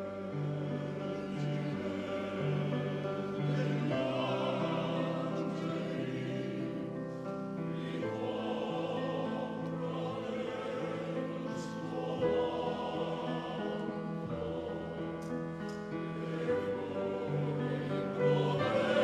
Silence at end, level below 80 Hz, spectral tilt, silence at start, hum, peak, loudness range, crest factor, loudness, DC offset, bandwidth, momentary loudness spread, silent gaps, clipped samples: 0 s; -66 dBFS; -7.5 dB/octave; 0 s; none; -18 dBFS; 3 LU; 18 dB; -36 LUFS; under 0.1%; 10 kHz; 7 LU; none; under 0.1%